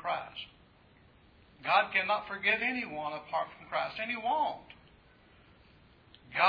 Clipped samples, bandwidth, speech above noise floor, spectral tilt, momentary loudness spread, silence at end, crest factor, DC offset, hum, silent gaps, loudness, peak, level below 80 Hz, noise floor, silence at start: under 0.1%; 5.2 kHz; 29 dB; -5.5 dB/octave; 14 LU; 0 s; 22 dB; under 0.1%; none; none; -32 LUFS; -12 dBFS; -68 dBFS; -61 dBFS; 0 s